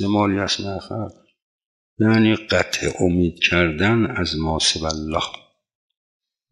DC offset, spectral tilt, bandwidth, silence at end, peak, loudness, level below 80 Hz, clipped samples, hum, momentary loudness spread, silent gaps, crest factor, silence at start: under 0.1%; -4.5 dB/octave; 12 kHz; 1.15 s; -4 dBFS; -20 LUFS; -46 dBFS; under 0.1%; none; 12 LU; 1.42-1.59 s, 1.66-1.97 s; 18 dB; 0 s